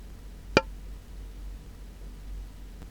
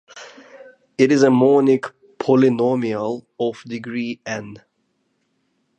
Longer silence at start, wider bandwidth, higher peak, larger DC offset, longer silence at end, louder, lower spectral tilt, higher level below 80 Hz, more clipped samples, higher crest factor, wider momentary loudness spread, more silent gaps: second, 0 s vs 0.15 s; first, 20 kHz vs 8.8 kHz; about the same, -2 dBFS vs -2 dBFS; neither; second, 0 s vs 1.2 s; second, -32 LUFS vs -18 LUFS; second, -4.5 dB/octave vs -6.5 dB/octave; first, -42 dBFS vs -68 dBFS; neither; first, 32 dB vs 18 dB; about the same, 20 LU vs 20 LU; neither